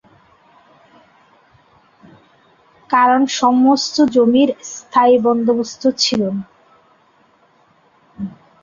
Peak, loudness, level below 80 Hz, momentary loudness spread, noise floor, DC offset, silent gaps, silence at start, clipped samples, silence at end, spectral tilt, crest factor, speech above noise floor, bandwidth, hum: -2 dBFS; -15 LUFS; -60 dBFS; 16 LU; -54 dBFS; under 0.1%; none; 2.9 s; under 0.1%; 0.35 s; -4 dB/octave; 16 dB; 40 dB; 7.4 kHz; none